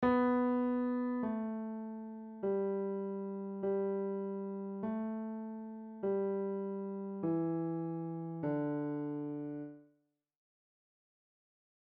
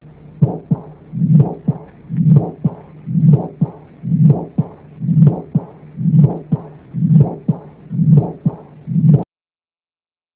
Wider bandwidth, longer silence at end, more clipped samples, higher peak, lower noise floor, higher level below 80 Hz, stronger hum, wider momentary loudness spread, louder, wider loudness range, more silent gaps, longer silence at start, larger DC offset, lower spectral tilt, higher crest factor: first, 4.4 kHz vs 2.2 kHz; first, 2.05 s vs 1.1 s; neither; second, -20 dBFS vs 0 dBFS; second, -77 dBFS vs under -90 dBFS; second, -72 dBFS vs -46 dBFS; neither; second, 10 LU vs 13 LU; second, -38 LUFS vs -16 LUFS; first, 4 LU vs 1 LU; neither; second, 0 s vs 0.35 s; neither; second, -8.5 dB/octave vs -15 dB/octave; about the same, 16 dB vs 16 dB